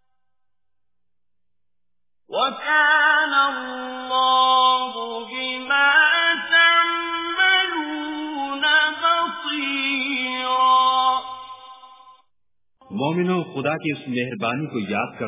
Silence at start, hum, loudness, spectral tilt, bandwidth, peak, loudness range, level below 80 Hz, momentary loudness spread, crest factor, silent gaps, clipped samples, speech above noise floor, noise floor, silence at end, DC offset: 2.3 s; none; -19 LUFS; -7 dB/octave; 3.9 kHz; -6 dBFS; 8 LU; -70 dBFS; 13 LU; 16 dB; none; under 0.1%; 64 dB; -86 dBFS; 0 s; under 0.1%